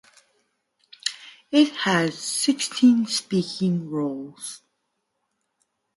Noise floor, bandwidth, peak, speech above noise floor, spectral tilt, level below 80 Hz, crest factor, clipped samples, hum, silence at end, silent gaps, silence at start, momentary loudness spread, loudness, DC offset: -76 dBFS; 11.5 kHz; -4 dBFS; 54 dB; -4 dB/octave; -70 dBFS; 20 dB; under 0.1%; none; 1.4 s; none; 1.05 s; 17 LU; -23 LUFS; under 0.1%